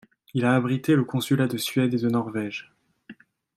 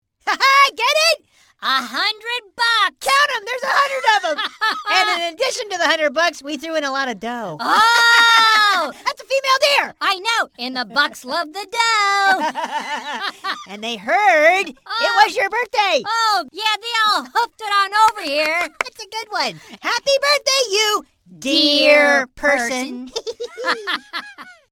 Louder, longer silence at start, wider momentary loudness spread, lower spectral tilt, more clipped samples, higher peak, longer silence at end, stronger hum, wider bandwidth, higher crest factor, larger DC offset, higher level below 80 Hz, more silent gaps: second, -24 LUFS vs -17 LUFS; about the same, 0.35 s vs 0.25 s; second, 9 LU vs 13 LU; first, -6 dB/octave vs -0.5 dB/octave; neither; second, -8 dBFS vs 0 dBFS; first, 0.45 s vs 0.2 s; neither; second, 15.5 kHz vs 17.5 kHz; about the same, 18 dB vs 18 dB; neither; second, -68 dBFS vs -62 dBFS; neither